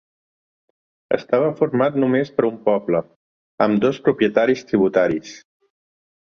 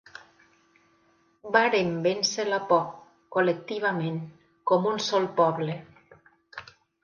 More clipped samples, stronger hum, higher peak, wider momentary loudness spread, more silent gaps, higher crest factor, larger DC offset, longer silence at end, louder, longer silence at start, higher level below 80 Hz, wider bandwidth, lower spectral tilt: neither; neither; first, -2 dBFS vs -6 dBFS; second, 6 LU vs 21 LU; first, 3.16-3.58 s vs none; about the same, 18 dB vs 22 dB; neither; first, 0.9 s vs 0.4 s; first, -19 LUFS vs -26 LUFS; second, 1.1 s vs 1.45 s; first, -60 dBFS vs -72 dBFS; second, 7 kHz vs 10 kHz; first, -7 dB/octave vs -4.5 dB/octave